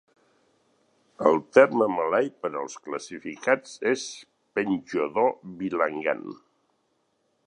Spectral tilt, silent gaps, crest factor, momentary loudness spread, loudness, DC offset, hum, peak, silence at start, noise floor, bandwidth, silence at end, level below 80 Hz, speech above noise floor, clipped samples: -5 dB/octave; none; 24 dB; 15 LU; -25 LUFS; under 0.1%; none; -2 dBFS; 1.2 s; -72 dBFS; 10.5 kHz; 1.1 s; -72 dBFS; 47 dB; under 0.1%